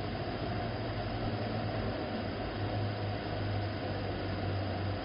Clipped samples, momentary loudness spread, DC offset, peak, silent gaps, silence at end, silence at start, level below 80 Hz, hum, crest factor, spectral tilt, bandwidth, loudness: under 0.1%; 2 LU; under 0.1%; -22 dBFS; none; 0 s; 0 s; -48 dBFS; none; 14 dB; -5.5 dB/octave; 5.4 kHz; -36 LUFS